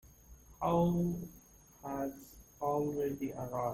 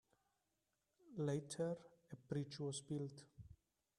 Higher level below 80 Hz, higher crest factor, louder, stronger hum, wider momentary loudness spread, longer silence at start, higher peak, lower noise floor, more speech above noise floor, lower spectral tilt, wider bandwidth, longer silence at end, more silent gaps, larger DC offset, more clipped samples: first, -58 dBFS vs -78 dBFS; about the same, 16 dB vs 18 dB; first, -36 LUFS vs -47 LUFS; neither; about the same, 19 LU vs 18 LU; second, 0.05 s vs 1.05 s; first, -20 dBFS vs -30 dBFS; second, -58 dBFS vs -88 dBFS; second, 23 dB vs 42 dB; first, -8 dB/octave vs -6 dB/octave; first, 16.5 kHz vs 12 kHz; second, 0 s vs 0.45 s; neither; neither; neither